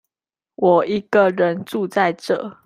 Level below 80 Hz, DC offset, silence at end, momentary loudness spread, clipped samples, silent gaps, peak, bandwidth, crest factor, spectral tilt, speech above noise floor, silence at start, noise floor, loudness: -62 dBFS; under 0.1%; 0.15 s; 8 LU; under 0.1%; none; -2 dBFS; 15.5 kHz; 18 dB; -6.5 dB/octave; over 72 dB; 0.6 s; under -90 dBFS; -19 LUFS